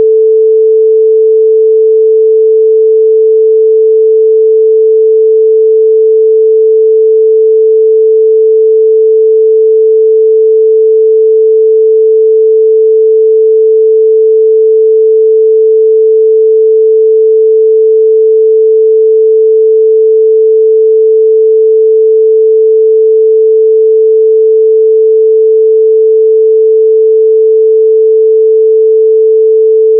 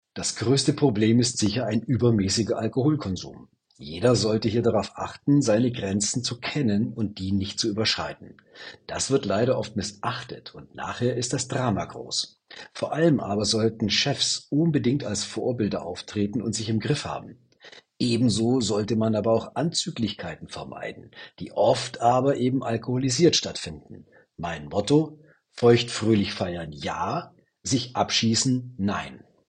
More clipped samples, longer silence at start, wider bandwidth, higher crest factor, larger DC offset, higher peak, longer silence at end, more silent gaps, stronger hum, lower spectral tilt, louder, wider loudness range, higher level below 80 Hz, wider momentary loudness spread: neither; second, 0 s vs 0.15 s; second, 0.5 kHz vs 10 kHz; second, 4 dB vs 20 dB; neither; first, -2 dBFS vs -6 dBFS; second, 0 s vs 0.3 s; neither; neither; first, -12.5 dB/octave vs -5 dB/octave; first, -6 LUFS vs -25 LUFS; second, 0 LU vs 4 LU; second, under -90 dBFS vs -56 dBFS; second, 0 LU vs 14 LU